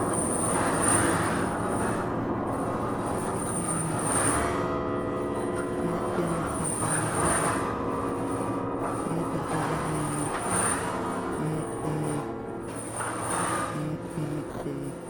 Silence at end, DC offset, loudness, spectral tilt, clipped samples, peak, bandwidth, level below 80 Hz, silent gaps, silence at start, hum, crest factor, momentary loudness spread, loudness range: 0 s; under 0.1%; -28 LUFS; -4.5 dB/octave; under 0.1%; -10 dBFS; over 20 kHz; -48 dBFS; none; 0 s; none; 18 dB; 8 LU; 4 LU